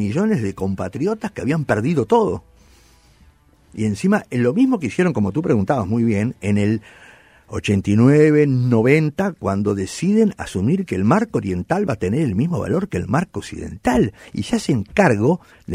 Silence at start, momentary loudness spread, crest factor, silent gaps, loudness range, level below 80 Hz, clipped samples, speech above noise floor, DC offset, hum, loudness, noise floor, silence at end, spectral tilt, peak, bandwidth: 0 s; 9 LU; 16 dB; none; 5 LU; -46 dBFS; under 0.1%; 34 dB; under 0.1%; none; -19 LUFS; -52 dBFS; 0 s; -7.5 dB/octave; -2 dBFS; 13 kHz